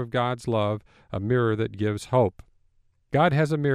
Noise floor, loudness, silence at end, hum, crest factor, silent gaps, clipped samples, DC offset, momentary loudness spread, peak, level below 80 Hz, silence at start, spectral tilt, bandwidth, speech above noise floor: -64 dBFS; -25 LUFS; 0 s; none; 16 dB; none; under 0.1%; under 0.1%; 8 LU; -10 dBFS; -54 dBFS; 0 s; -7.5 dB/octave; 12 kHz; 40 dB